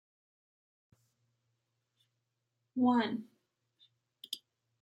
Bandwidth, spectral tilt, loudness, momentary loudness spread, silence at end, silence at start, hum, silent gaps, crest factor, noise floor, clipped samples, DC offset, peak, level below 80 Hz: 15.5 kHz; -5 dB/octave; -34 LUFS; 15 LU; 0.45 s; 2.75 s; none; none; 22 dB; -85 dBFS; under 0.1%; under 0.1%; -18 dBFS; -90 dBFS